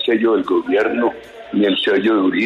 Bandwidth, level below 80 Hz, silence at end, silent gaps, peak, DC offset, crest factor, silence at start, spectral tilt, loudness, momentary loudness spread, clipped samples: 7 kHz; -58 dBFS; 0 s; none; -4 dBFS; under 0.1%; 12 dB; 0 s; -6.5 dB/octave; -17 LUFS; 7 LU; under 0.1%